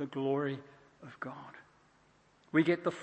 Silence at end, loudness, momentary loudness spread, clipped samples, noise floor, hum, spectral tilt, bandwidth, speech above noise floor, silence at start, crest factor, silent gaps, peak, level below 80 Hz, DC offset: 0 s; -34 LUFS; 24 LU; under 0.1%; -67 dBFS; none; -7.5 dB/octave; 8.6 kHz; 33 dB; 0 s; 22 dB; none; -14 dBFS; -80 dBFS; under 0.1%